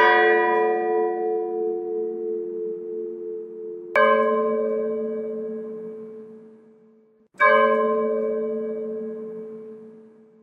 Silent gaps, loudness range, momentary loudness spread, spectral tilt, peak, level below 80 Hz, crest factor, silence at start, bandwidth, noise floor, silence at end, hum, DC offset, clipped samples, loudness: none; 3 LU; 19 LU; -6 dB/octave; -4 dBFS; -84 dBFS; 20 dB; 0 s; 5.6 kHz; -56 dBFS; 0.35 s; none; under 0.1%; under 0.1%; -23 LUFS